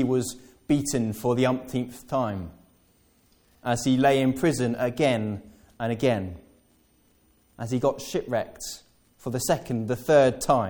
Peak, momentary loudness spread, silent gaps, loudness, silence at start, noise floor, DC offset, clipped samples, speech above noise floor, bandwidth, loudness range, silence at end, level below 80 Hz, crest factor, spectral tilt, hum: -6 dBFS; 16 LU; none; -25 LUFS; 0 s; -63 dBFS; under 0.1%; under 0.1%; 38 dB; 18 kHz; 5 LU; 0 s; -54 dBFS; 20 dB; -5.5 dB/octave; none